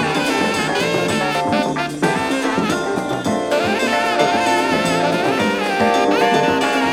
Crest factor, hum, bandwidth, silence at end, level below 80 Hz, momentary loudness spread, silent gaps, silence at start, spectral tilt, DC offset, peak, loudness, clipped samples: 14 dB; none; 17 kHz; 0 s; -50 dBFS; 4 LU; none; 0 s; -4 dB/octave; under 0.1%; -2 dBFS; -17 LUFS; under 0.1%